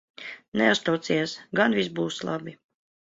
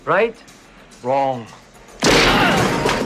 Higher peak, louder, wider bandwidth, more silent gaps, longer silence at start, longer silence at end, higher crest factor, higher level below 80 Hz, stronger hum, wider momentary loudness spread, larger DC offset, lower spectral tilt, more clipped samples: second, -6 dBFS vs -2 dBFS; second, -25 LUFS vs -16 LUFS; second, 7.8 kHz vs 15 kHz; first, 0.48-0.52 s vs none; first, 0.2 s vs 0.05 s; first, 0.6 s vs 0 s; about the same, 20 dB vs 16 dB; second, -66 dBFS vs -36 dBFS; neither; first, 15 LU vs 11 LU; neither; about the same, -4.5 dB/octave vs -3.5 dB/octave; neither